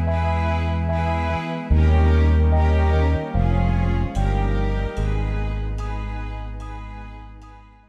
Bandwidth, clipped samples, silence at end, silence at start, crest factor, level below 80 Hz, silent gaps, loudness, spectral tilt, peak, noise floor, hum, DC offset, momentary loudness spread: 6.4 kHz; under 0.1%; 0.3 s; 0 s; 14 dB; -22 dBFS; none; -21 LUFS; -8.5 dB/octave; -6 dBFS; -43 dBFS; none; under 0.1%; 16 LU